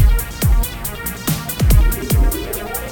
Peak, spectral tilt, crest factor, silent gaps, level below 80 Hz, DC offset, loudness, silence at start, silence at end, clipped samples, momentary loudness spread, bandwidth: -2 dBFS; -5 dB/octave; 14 dB; none; -16 dBFS; under 0.1%; -18 LUFS; 0 s; 0 s; under 0.1%; 8 LU; over 20 kHz